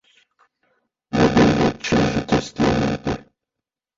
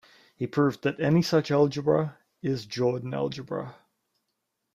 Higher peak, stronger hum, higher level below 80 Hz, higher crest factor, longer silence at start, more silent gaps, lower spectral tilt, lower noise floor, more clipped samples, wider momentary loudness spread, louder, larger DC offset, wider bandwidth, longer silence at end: first, -4 dBFS vs -10 dBFS; neither; first, -38 dBFS vs -66 dBFS; about the same, 18 dB vs 18 dB; first, 1.1 s vs 0.4 s; neither; about the same, -6 dB/octave vs -7 dB/octave; first, -85 dBFS vs -80 dBFS; neither; about the same, 11 LU vs 12 LU; first, -19 LUFS vs -27 LUFS; neither; second, 7.8 kHz vs 15 kHz; second, 0.8 s vs 1.05 s